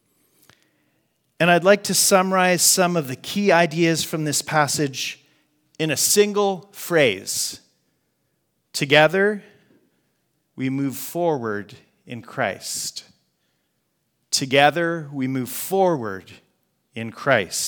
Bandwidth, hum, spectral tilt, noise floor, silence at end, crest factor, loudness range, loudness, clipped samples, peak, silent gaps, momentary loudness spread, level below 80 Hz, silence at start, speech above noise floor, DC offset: over 20 kHz; none; -3 dB/octave; -72 dBFS; 0 s; 22 dB; 9 LU; -20 LUFS; under 0.1%; 0 dBFS; none; 16 LU; -68 dBFS; 1.4 s; 51 dB; under 0.1%